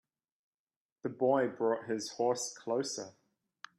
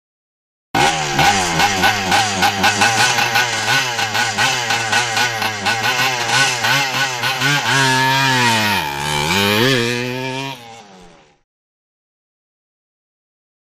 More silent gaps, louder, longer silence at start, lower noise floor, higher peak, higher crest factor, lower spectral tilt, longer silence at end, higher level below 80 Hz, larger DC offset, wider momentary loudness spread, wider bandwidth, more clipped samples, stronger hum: neither; second, -34 LUFS vs -15 LUFS; first, 1.05 s vs 0.75 s; first, -57 dBFS vs -44 dBFS; second, -16 dBFS vs 0 dBFS; about the same, 20 dB vs 18 dB; first, -4 dB/octave vs -2.5 dB/octave; second, 0.7 s vs 2.6 s; second, -84 dBFS vs -48 dBFS; neither; first, 13 LU vs 5 LU; second, 13.5 kHz vs 15.5 kHz; neither; neither